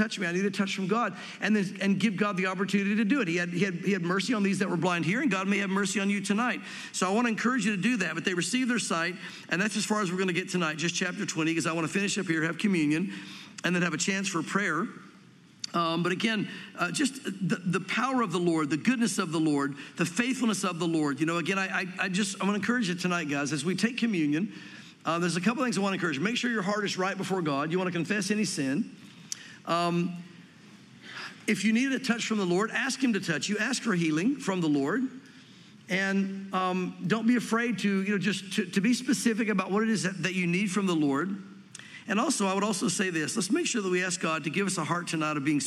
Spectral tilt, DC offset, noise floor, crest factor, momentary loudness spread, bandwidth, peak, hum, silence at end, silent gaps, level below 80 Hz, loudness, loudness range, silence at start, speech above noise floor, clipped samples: -4.5 dB/octave; under 0.1%; -55 dBFS; 18 dB; 5 LU; 14 kHz; -10 dBFS; none; 0 s; none; -80 dBFS; -28 LUFS; 2 LU; 0 s; 26 dB; under 0.1%